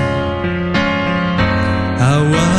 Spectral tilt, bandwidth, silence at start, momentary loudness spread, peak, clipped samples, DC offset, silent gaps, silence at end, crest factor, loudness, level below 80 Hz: -6 dB/octave; 11 kHz; 0 s; 5 LU; -2 dBFS; under 0.1%; under 0.1%; none; 0 s; 14 dB; -15 LUFS; -32 dBFS